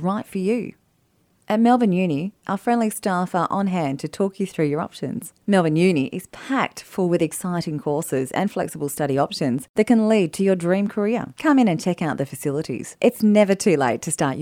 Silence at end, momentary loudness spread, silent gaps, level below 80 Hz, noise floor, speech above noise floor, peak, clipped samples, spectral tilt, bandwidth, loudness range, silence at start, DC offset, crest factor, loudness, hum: 0 s; 9 LU; 9.69-9.74 s; -62 dBFS; -63 dBFS; 43 dB; -4 dBFS; under 0.1%; -6 dB/octave; 16.5 kHz; 3 LU; 0 s; under 0.1%; 16 dB; -21 LUFS; none